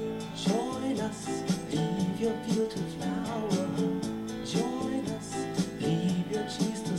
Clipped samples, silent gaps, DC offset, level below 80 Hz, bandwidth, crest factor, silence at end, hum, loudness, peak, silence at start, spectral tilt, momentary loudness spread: under 0.1%; none; under 0.1%; -58 dBFS; 15.5 kHz; 16 dB; 0 s; none; -31 LUFS; -14 dBFS; 0 s; -5.5 dB/octave; 4 LU